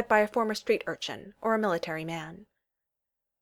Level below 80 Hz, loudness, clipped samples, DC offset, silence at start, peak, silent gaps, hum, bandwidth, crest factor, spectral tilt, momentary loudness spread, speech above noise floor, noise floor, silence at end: -68 dBFS; -30 LUFS; under 0.1%; under 0.1%; 0 s; -8 dBFS; none; none; 17 kHz; 22 dB; -4.5 dB/octave; 12 LU; 57 dB; -87 dBFS; 1 s